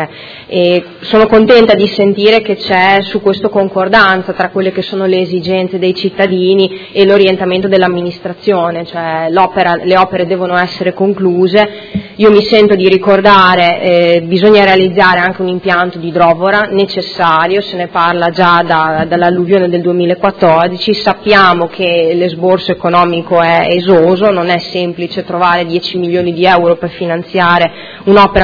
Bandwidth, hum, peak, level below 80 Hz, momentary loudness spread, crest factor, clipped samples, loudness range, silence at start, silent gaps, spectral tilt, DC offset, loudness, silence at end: 5.4 kHz; none; 0 dBFS; -40 dBFS; 8 LU; 10 dB; 1%; 4 LU; 0 s; none; -7 dB/octave; under 0.1%; -9 LUFS; 0 s